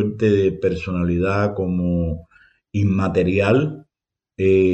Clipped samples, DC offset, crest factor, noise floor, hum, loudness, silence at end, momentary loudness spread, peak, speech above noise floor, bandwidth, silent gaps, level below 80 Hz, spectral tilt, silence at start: under 0.1%; under 0.1%; 14 dB; -86 dBFS; none; -20 LUFS; 0 s; 10 LU; -6 dBFS; 68 dB; 8.4 kHz; none; -46 dBFS; -8.5 dB/octave; 0 s